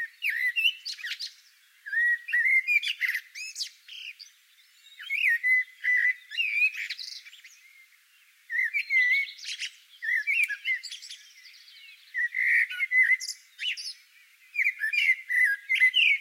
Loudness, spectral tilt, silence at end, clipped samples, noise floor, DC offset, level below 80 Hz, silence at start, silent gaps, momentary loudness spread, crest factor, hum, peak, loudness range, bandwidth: -25 LUFS; 11.5 dB/octave; 0 s; under 0.1%; -61 dBFS; under 0.1%; under -90 dBFS; 0 s; none; 17 LU; 18 dB; none; -12 dBFS; 3 LU; 16 kHz